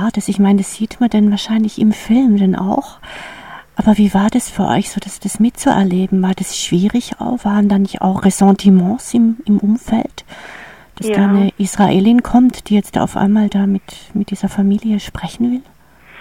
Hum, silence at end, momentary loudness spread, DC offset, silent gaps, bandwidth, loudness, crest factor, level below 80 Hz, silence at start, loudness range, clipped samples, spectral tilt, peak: none; 0 s; 13 LU; 0.4%; none; 15.5 kHz; -14 LUFS; 14 dB; -42 dBFS; 0 s; 3 LU; under 0.1%; -6 dB/octave; 0 dBFS